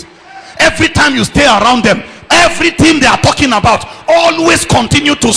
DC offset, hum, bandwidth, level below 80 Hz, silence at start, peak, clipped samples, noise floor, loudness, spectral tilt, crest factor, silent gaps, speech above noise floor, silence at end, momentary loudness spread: under 0.1%; none; 11 kHz; -30 dBFS; 0 s; 0 dBFS; under 0.1%; -33 dBFS; -8 LUFS; -3.5 dB/octave; 10 dB; none; 24 dB; 0 s; 4 LU